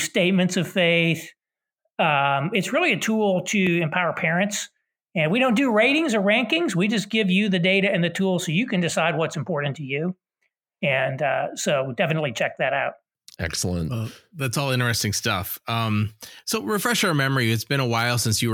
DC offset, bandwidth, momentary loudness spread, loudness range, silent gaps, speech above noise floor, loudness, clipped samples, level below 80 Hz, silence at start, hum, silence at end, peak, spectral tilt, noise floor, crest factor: under 0.1%; 19 kHz; 8 LU; 5 LU; none; 56 dB; -22 LUFS; under 0.1%; -56 dBFS; 0 s; none; 0 s; -6 dBFS; -4.5 dB/octave; -79 dBFS; 16 dB